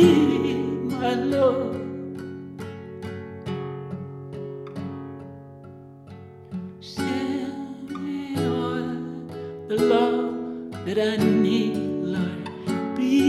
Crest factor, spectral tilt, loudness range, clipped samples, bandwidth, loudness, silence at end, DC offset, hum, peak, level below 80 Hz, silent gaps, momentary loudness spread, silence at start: 20 dB; -7 dB/octave; 12 LU; under 0.1%; 13.5 kHz; -26 LUFS; 0 s; under 0.1%; none; -4 dBFS; -64 dBFS; none; 16 LU; 0 s